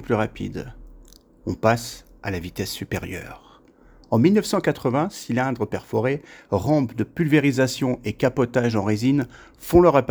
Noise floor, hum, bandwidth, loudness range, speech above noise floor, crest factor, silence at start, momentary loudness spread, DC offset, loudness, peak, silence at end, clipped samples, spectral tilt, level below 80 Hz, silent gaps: -51 dBFS; none; over 20 kHz; 7 LU; 30 dB; 20 dB; 0 s; 15 LU; under 0.1%; -22 LUFS; -2 dBFS; 0 s; under 0.1%; -6.5 dB/octave; -46 dBFS; none